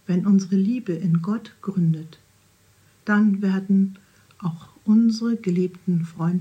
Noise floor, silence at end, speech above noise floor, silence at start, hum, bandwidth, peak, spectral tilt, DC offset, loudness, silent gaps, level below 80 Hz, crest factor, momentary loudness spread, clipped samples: -58 dBFS; 0 s; 37 dB; 0.1 s; none; 8.6 kHz; -8 dBFS; -8 dB/octave; under 0.1%; -22 LUFS; none; -70 dBFS; 14 dB; 12 LU; under 0.1%